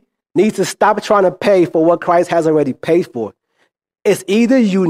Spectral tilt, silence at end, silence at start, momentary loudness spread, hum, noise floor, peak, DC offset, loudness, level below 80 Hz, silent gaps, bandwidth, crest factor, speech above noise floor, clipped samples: -6 dB/octave; 0 s; 0.35 s; 8 LU; none; -63 dBFS; 0 dBFS; under 0.1%; -14 LUFS; -60 dBFS; none; 15.5 kHz; 14 dB; 50 dB; under 0.1%